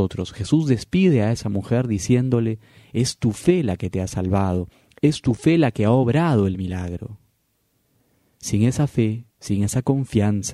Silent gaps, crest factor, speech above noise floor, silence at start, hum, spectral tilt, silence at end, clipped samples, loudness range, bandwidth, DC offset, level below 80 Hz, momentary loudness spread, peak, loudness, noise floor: none; 18 dB; 48 dB; 0 s; none; -6.5 dB/octave; 0 s; under 0.1%; 4 LU; 13 kHz; under 0.1%; -46 dBFS; 11 LU; -4 dBFS; -21 LUFS; -68 dBFS